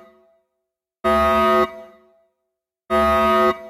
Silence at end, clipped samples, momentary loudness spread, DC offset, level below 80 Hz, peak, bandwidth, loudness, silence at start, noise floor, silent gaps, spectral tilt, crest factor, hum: 0 s; under 0.1%; 8 LU; under 0.1%; -42 dBFS; -8 dBFS; 14.5 kHz; -18 LUFS; 1.05 s; -80 dBFS; none; -5.5 dB/octave; 14 dB; none